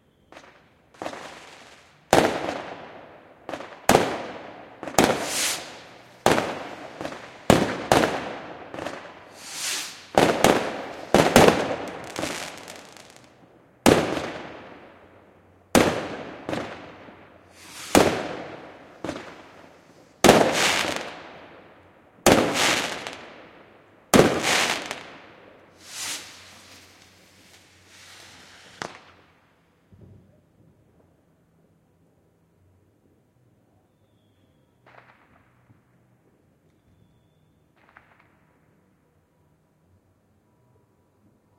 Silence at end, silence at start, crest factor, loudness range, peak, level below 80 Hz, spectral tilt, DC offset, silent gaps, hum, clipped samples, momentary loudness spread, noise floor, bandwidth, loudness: 12.65 s; 0.35 s; 26 dB; 17 LU; 0 dBFS; -52 dBFS; -3.5 dB/octave; under 0.1%; none; none; under 0.1%; 25 LU; -64 dBFS; 16 kHz; -22 LUFS